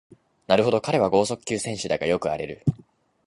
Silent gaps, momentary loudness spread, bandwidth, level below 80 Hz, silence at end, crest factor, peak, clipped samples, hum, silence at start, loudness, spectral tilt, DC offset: none; 8 LU; 11.5 kHz; -54 dBFS; 0.5 s; 22 dB; -4 dBFS; under 0.1%; none; 0.5 s; -24 LUFS; -5 dB/octave; under 0.1%